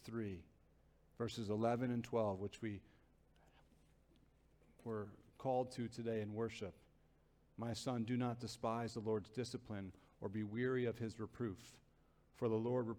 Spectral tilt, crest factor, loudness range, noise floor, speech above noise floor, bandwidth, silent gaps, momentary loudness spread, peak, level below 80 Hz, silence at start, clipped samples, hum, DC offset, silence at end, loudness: -6.5 dB/octave; 18 dB; 4 LU; -73 dBFS; 30 dB; 15 kHz; none; 12 LU; -26 dBFS; -72 dBFS; 0 s; under 0.1%; none; under 0.1%; 0 s; -43 LUFS